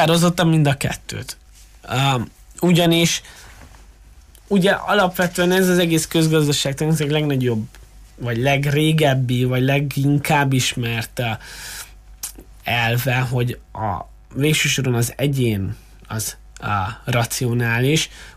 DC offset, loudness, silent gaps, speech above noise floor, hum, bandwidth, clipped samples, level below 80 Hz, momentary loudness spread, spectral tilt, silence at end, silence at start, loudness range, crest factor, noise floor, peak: under 0.1%; -19 LUFS; none; 27 dB; none; 15.5 kHz; under 0.1%; -44 dBFS; 15 LU; -5 dB/octave; 0.05 s; 0 s; 4 LU; 14 dB; -45 dBFS; -6 dBFS